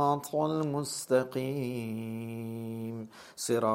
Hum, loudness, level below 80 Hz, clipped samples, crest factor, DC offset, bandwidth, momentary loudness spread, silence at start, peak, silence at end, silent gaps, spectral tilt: none; -33 LUFS; -74 dBFS; under 0.1%; 18 dB; under 0.1%; 16 kHz; 10 LU; 0 s; -12 dBFS; 0 s; none; -5.5 dB/octave